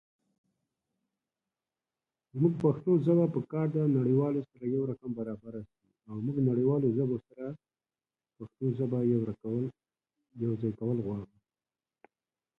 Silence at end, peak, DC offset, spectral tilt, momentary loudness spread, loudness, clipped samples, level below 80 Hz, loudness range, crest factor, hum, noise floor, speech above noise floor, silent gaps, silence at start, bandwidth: 1.35 s; -14 dBFS; under 0.1%; -12 dB/octave; 16 LU; -31 LUFS; under 0.1%; -68 dBFS; 6 LU; 18 dB; none; under -90 dBFS; over 60 dB; none; 2.35 s; 4 kHz